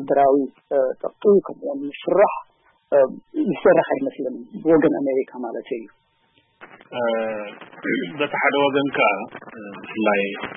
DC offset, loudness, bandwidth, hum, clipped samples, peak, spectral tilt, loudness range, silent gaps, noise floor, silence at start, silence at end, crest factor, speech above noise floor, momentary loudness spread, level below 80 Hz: under 0.1%; -21 LUFS; 3.7 kHz; none; under 0.1%; -4 dBFS; -10.5 dB/octave; 6 LU; none; -62 dBFS; 0 s; 0 s; 16 dB; 42 dB; 15 LU; -62 dBFS